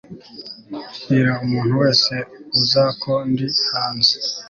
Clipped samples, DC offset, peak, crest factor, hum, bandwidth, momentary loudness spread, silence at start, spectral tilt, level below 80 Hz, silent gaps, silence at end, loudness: under 0.1%; under 0.1%; -2 dBFS; 18 dB; none; 7.4 kHz; 18 LU; 0.1 s; -5 dB/octave; -56 dBFS; none; 0 s; -17 LUFS